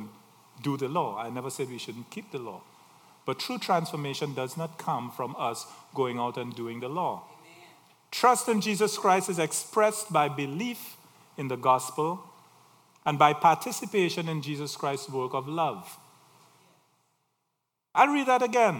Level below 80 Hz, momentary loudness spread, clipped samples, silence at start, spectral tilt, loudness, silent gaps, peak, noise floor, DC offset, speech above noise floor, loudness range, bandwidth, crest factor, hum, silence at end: -84 dBFS; 16 LU; under 0.1%; 0 s; -4 dB/octave; -28 LUFS; none; -6 dBFS; -82 dBFS; under 0.1%; 54 dB; 8 LU; 18 kHz; 24 dB; none; 0 s